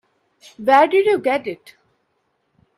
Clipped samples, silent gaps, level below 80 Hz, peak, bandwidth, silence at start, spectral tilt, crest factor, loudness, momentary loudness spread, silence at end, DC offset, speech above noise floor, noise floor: under 0.1%; none; -68 dBFS; 0 dBFS; 13.5 kHz; 0.6 s; -5 dB/octave; 20 dB; -17 LUFS; 17 LU; 1.25 s; under 0.1%; 52 dB; -69 dBFS